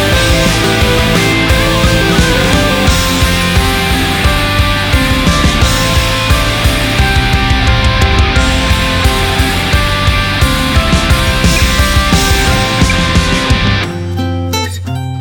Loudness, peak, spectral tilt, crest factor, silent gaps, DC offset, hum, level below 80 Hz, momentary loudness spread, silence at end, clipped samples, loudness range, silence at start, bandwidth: -10 LUFS; 0 dBFS; -4 dB/octave; 10 dB; none; under 0.1%; none; -16 dBFS; 2 LU; 0 s; under 0.1%; 1 LU; 0 s; over 20 kHz